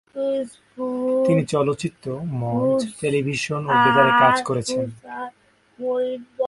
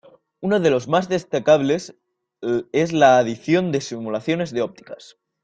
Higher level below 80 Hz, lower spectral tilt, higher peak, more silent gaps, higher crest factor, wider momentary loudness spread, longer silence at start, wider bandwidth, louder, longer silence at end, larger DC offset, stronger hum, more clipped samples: about the same, -58 dBFS vs -60 dBFS; about the same, -5.5 dB/octave vs -5.5 dB/octave; about the same, -2 dBFS vs -2 dBFS; neither; about the same, 20 dB vs 18 dB; about the same, 16 LU vs 15 LU; second, 0.15 s vs 0.4 s; first, 11.5 kHz vs 9 kHz; about the same, -21 LUFS vs -20 LUFS; second, 0 s vs 0.5 s; neither; neither; neither